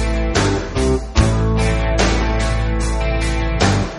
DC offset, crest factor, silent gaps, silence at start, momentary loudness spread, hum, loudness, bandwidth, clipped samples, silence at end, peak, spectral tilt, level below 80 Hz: under 0.1%; 16 dB; none; 0 s; 3 LU; none; -18 LUFS; 11.5 kHz; under 0.1%; 0 s; 0 dBFS; -5.5 dB/octave; -20 dBFS